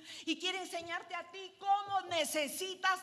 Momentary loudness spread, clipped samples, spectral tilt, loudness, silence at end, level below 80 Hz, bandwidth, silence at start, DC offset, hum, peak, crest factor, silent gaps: 9 LU; under 0.1%; -1 dB/octave; -36 LUFS; 0 s; -84 dBFS; 13.5 kHz; 0 s; under 0.1%; none; -20 dBFS; 18 dB; none